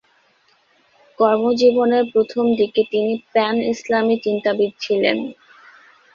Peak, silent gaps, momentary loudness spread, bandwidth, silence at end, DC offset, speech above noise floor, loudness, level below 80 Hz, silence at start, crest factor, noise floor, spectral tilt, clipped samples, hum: -2 dBFS; none; 6 LU; 7.2 kHz; 0.8 s; under 0.1%; 41 dB; -18 LUFS; -64 dBFS; 1.2 s; 16 dB; -59 dBFS; -5.5 dB/octave; under 0.1%; none